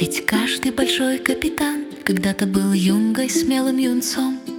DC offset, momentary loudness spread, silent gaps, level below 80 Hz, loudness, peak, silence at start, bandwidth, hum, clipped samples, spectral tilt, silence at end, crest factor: under 0.1%; 5 LU; none; -50 dBFS; -20 LUFS; 0 dBFS; 0 s; 18 kHz; none; under 0.1%; -4 dB/octave; 0 s; 20 dB